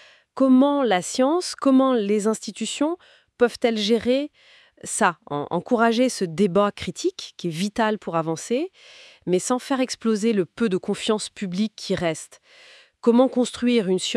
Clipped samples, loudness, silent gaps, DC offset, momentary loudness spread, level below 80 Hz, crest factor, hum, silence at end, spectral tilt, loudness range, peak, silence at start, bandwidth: under 0.1%; -22 LUFS; none; under 0.1%; 10 LU; -62 dBFS; 20 dB; none; 0 s; -4.5 dB/octave; 4 LU; -4 dBFS; 0.35 s; 12 kHz